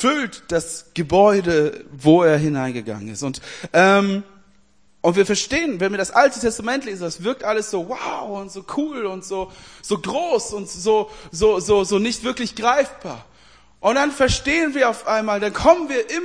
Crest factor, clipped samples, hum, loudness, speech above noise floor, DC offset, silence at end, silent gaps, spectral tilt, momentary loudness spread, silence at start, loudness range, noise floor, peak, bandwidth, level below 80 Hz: 18 dB; under 0.1%; none; -20 LUFS; 40 dB; 0.2%; 0 s; none; -4.5 dB/octave; 13 LU; 0 s; 6 LU; -59 dBFS; 0 dBFS; 10.5 kHz; -44 dBFS